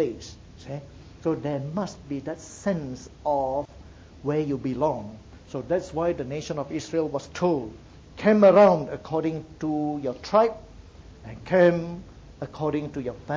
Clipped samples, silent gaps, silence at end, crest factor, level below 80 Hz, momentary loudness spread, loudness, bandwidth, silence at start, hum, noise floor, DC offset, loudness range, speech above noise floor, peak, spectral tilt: under 0.1%; none; 0 s; 20 dB; -52 dBFS; 20 LU; -25 LUFS; 8 kHz; 0 s; none; -46 dBFS; under 0.1%; 8 LU; 22 dB; -6 dBFS; -7 dB/octave